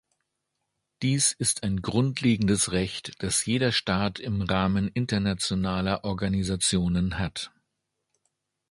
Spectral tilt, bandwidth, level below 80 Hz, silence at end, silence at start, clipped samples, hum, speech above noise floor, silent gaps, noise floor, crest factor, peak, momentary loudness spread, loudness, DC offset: -4 dB/octave; 11.5 kHz; -46 dBFS; 1.25 s; 1 s; under 0.1%; none; 55 dB; none; -81 dBFS; 18 dB; -8 dBFS; 7 LU; -26 LUFS; under 0.1%